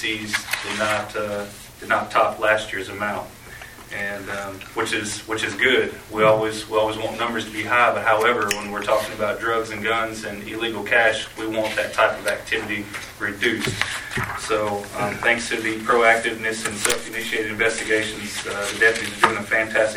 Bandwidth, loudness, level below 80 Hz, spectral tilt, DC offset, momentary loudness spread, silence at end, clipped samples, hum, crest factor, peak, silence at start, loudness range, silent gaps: 16.5 kHz; -22 LUFS; -50 dBFS; -3 dB/octave; under 0.1%; 10 LU; 0 s; under 0.1%; none; 22 dB; 0 dBFS; 0 s; 4 LU; none